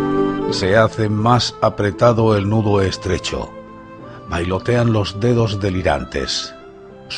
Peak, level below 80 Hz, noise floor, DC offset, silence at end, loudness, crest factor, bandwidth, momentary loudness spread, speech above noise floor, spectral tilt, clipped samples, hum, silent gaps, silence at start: 0 dBFS; -38 dBFS; -38 dBFS; under 0.1%; 0 s; -17 LUFS; 18 dB; 10 kHz; 14 LU; 22 dB; -6 dB/octave; under 0.1%; none; none; 0 s